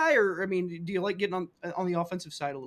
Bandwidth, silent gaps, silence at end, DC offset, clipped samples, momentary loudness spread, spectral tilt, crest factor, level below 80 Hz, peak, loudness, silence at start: 14 kHz; none; 0 s; under 0.1%; under 0.1%; 10 LU; -5.5 dB/octave; 18 dB; -70 dBFS; -12 dBFS; -30 LUFS; 0 s